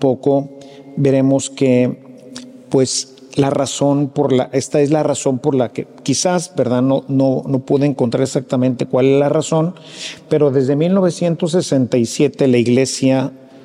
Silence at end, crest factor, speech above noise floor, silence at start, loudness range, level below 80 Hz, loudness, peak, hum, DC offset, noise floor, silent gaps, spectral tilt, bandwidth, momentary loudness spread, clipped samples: 0.05 s; 14 dB; 20 dB; 0 s; 2 LU; -62 dBFS; -16 LUFS; -2 dBFS; none; under 0.1%; -35 dBFS; none; -6 dB/octave; 12 kHz; 9 LU; under 0.1%